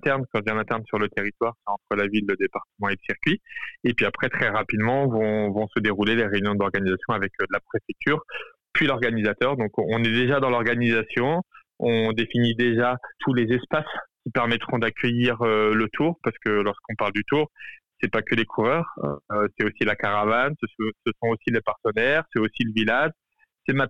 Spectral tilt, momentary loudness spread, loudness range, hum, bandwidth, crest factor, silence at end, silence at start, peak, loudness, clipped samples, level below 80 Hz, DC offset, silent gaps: -7.5 dB/octave; 7 LU; 2 LU; none; 8.2 kHz; 14 dB; 0 s; 0 s; -10 dBFS; -24 LUFS; under 0.1%; -58 dBFS; 0.4%; none